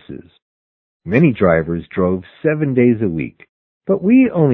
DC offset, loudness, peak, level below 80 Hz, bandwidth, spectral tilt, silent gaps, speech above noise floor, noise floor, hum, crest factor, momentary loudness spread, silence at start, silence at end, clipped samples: under 0.1%; -16 LUFS; 0 dBFS; -42 dBFS; 4 kHz; -11.5 dB/octave; 0.42-1.00 s, 3.49-3.80 s; over 75 dB; under -90 dBFS; none; 16 dB; 18 LU; 0.1 s; 0 s; under 0.1%